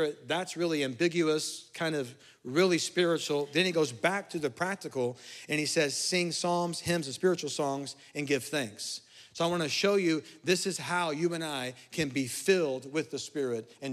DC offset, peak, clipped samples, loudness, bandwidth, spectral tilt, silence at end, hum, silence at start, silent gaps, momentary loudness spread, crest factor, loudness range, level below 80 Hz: under 0.1%; -12 dBFS; under 0.1%; -30 LUFS; 15.5 kHz; -4 dB/octave; 0 s; none; 0 s; none; 9 LU; 18 dB; 2 LU; -74 dBFS